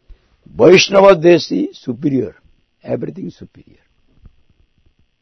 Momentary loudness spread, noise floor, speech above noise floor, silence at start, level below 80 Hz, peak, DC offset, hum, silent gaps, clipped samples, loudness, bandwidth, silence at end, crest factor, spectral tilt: 21 LU; -57 dBFS; 44 dB; 0.55 s; -50 dBFS; 0 dBFS; under 0.1%; none; none; 0.2%; -12 LUFS; 6.4 kHz; 1.75 s; 16 dB; -5 dB/octave